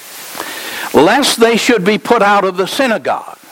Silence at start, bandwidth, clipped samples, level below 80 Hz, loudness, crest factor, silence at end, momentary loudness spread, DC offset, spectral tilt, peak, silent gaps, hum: 0 s; 17 kHz; under 0.1%; -52 dBFS; -12 LUFS; 12 dB; 0.2 s; 13 LU; under 0.1%; -3.5 dB/octave; 0 dBFS; none; none